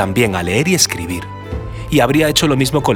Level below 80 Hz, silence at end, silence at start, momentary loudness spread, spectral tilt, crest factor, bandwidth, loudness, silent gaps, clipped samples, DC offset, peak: -34 dBFS; 0 s; 0 s; 14 LU; -4 dB/octave; 16 dB; over 20 kHz; -14 LUFS; none; under 0.1%; under 0.1%; 0 dBFS